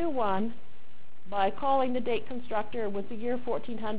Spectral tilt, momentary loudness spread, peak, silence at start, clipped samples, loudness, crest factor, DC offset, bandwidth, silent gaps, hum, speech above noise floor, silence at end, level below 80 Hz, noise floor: -9 dB/octave; 7 LU; -14 dBFS; 0 s; under 0.1%; -31 LUFS; 16 dB; 4%; 4 kHz; none; none; 29 dB; 0 s; -58 dBFS; -59 dBFS